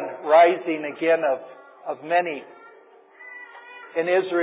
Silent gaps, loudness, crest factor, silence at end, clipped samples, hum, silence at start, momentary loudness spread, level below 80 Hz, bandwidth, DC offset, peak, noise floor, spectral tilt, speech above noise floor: none; -21 LUFS; 18 dB; 0 s; under 0.1%; none; 0 s; 24 LU; under -90 dBFS; 4 kHz; under 0.1%; -4 dBFS; -51 dBFS; -8 dB/octave; 30 dB